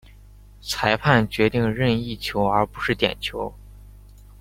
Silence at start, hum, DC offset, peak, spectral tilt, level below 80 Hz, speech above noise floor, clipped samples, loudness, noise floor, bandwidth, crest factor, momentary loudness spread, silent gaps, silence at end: 0.65 s; 50 Hz at -40 dBFS; under 0.1%; -2 dBFS; -5.5 dB/octave; -44 dBFS; 25 dB; under 0.1%; -22 LUFS; -46 dBFS; 16.5 kHz; 22 dB; 11 LU; none; 0.5 s